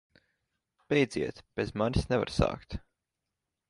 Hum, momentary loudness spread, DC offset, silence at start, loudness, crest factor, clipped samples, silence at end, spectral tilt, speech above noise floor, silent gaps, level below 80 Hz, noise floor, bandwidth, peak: none; 13 LU; under 0.1%; 0.9 s; -30 LUFS; 22 dB; under 0.1%; 0.9 s; -6.5 dB/octave; 57 dB; none; -46 dBFS; -87 dBFS; 11.5 kHz; -10 dBFS